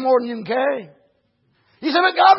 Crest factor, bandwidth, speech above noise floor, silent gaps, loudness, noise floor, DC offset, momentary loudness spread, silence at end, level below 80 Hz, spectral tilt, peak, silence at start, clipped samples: 18 dB; 5.8 kHz; 48 dB; none; -20 LUFS; -65 dBFS; under 0.1%; 11 LU; 0 s; -76 dBFS; -8 dB/octave; -2 dBFS; 0 s; under 0.1%